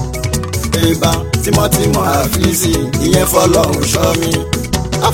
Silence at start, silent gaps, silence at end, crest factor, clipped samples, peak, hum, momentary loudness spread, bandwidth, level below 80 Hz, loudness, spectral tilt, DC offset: 0 s; none; 0 s; 12 dB; under 0.1%; 0 dBFS; none; 7 LU; 17 kHz; -26 dBFS; -13 LUFS; -4.5 dB/octave; under 0.1%